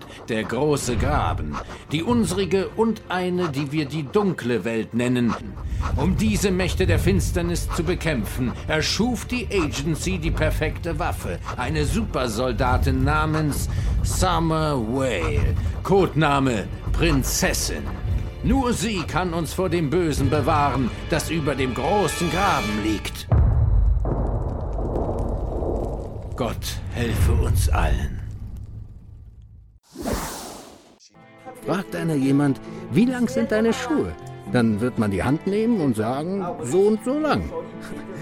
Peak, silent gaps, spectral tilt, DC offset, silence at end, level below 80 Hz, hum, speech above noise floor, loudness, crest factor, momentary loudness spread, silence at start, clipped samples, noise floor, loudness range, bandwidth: -4 dBFS; none; -5.5 dB/octave; under 0.1%; 0 s; -30 dBFS; none; 28 dB; -23 LUFS; 18 dB; 9 LU; 0 s; under 0.1%; -50 dBFS; 4 LU; 17 kHz